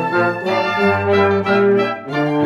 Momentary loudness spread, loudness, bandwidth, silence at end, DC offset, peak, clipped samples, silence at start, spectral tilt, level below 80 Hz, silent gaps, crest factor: 5 LU; -16 LUFS; 7.6 kHz; 0 s; under 0.1%; -2 dBFS; under 0.1%; 0 s; -7 dB/octave; -62 dBFS; none; 14 dB